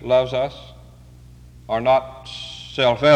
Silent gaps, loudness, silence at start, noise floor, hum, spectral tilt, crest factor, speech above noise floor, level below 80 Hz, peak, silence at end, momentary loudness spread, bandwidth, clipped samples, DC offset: none; -21 LUFS; 0 s; -44 dBFS; none; -5.5 dB/octave; 18 dB; 26 dB; -46 dBFS; -4 dBFS; 0 s; 16 LU; 9.2 kHz; under 0.1%; under 0.1%